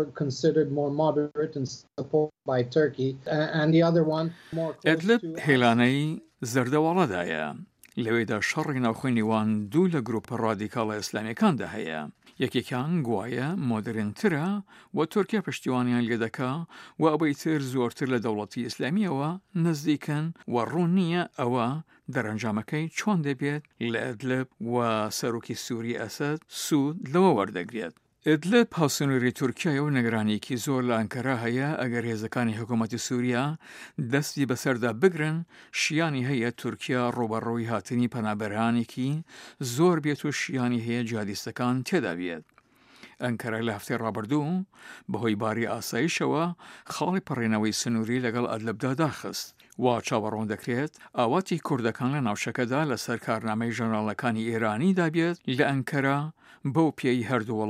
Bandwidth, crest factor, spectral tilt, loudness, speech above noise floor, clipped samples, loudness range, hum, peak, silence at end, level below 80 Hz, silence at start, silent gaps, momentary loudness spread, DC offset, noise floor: 15.5 kHz; 22 dB; -6 dB/octave; -27 LUFS; 31 dB; under 0.1%; 4 LU; none; -6 dBFS; 0 s; -70 dBFS; 0 s; none; 8 LU; under 0.1%; -58 dBFS